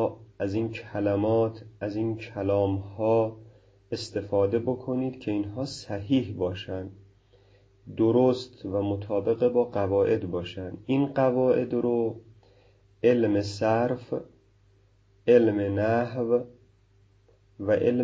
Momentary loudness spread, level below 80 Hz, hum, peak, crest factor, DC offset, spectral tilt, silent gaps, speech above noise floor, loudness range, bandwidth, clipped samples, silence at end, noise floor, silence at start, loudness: 12 LU; -54 dBFS; none; -8 dBFS; 18 dB; under 0.1%; -7.5 dB/octave; none; 35 dB; 3 LU; 8 kHz; under 0.1%; 0 s; -61 dBFS; 0 s; -27 LUFS